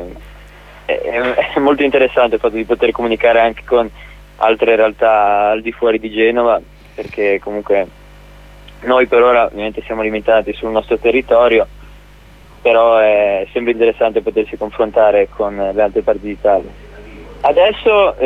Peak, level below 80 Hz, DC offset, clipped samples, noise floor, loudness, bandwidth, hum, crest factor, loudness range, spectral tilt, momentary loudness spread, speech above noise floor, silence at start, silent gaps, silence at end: 0 dBFS; -40 dBFS; under 0.1%; under 0.1%; -40 dBFS; -14 LUFS; 7.2 kHz; 50 Hz at -40 dBFS; 14 dB; 2 LU; -6 dB/octave; 9 LU; 27 dB; 0 s; none; 0 s